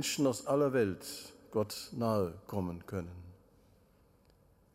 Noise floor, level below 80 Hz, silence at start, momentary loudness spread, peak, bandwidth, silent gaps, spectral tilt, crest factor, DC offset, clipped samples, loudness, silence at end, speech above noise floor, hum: -66 dBFS; -66 dBFS; 0 s; 14 LU; -18 dBFS; 16 kHz; none; -5 dB/octave; 18 dB; under 0.1%; under 0.1%; -35 LUFS; 1.4 s; 32 dB; none